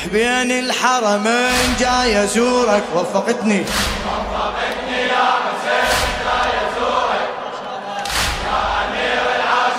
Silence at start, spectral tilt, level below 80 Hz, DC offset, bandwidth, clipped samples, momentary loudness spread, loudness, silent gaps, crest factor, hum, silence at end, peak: 0 s; -3 dB/octave; -36 dBFS; under 0.1%; 16 kHz; under 0.1%; 6 LU; -17 LUFS; none; 18 dB; none; 0 s; 0 dBFS